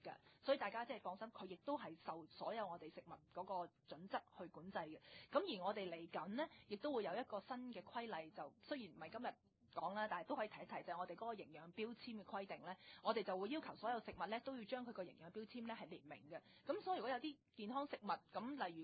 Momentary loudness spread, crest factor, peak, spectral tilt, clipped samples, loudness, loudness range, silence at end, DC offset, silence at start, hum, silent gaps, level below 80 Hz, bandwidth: 11 LU; 22 dB; -26 dBFS; -3 dB/octave; under 0.1%; -49 LUFS; 3 LU; 0 s; under 0.1%; 0.05 s; none; none; -84 dBFS; 4.8 kHz